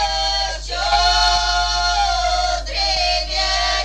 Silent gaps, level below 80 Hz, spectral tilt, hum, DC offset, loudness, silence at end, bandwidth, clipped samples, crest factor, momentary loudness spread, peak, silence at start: none; -28 dBFS; -1 dB/octave; none; under 0.1%; -17 LUFS; 0 s; 11.5 kHz; under 0.1%; 16 dB; 6 LU; -4 dBFS; 0 s